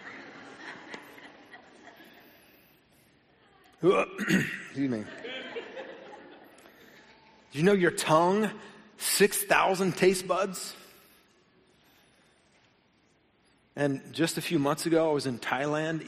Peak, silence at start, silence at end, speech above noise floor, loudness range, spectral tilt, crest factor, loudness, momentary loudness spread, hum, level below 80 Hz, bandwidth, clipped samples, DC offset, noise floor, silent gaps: -8 dBFS; 0 s; 0 s; 40 dB; 14 LU; -4.5 dB/octave; 22 dB; -27 LUFS; 22 LU; none; -66 dBFS; 15 kHz; under 0.1%; under 0.1%; -67 dBFS; none